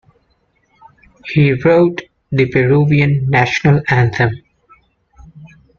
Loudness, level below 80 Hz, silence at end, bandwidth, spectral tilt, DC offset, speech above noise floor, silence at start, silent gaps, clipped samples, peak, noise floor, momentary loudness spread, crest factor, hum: -13 LUFS; -44 dBFS; 0.3 s; 7 kHz; -7.5 dB/octave; under 0.1%; 48 dB; 1.25 s; none; under 0.1%; -2 dBFS; -60 dBFS; 9 LU; 14 dB; none